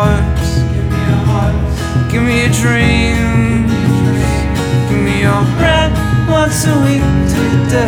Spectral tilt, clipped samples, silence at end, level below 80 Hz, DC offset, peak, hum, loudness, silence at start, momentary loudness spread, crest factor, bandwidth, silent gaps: -6 dB/octave; under 0.1%; 0 s; -20 dBFS; under 0.1%; 0 dBFS; none; -12 LUFS; 0 s; 4 LU; 10 dB; 16.5 kHz; none